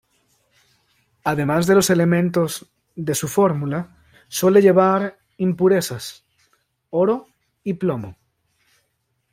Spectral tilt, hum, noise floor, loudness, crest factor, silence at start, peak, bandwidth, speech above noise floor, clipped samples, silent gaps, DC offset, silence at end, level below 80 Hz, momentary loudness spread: -5.5 dB/octave; none; -71 dBFS; -19 LUFS; 18 dB; 1.25 s; -2 dBFS; 16 kHz; 53 dB; under 0.1%; none; under 0.1%; 1.2 s; -58 dBFS; 17 LU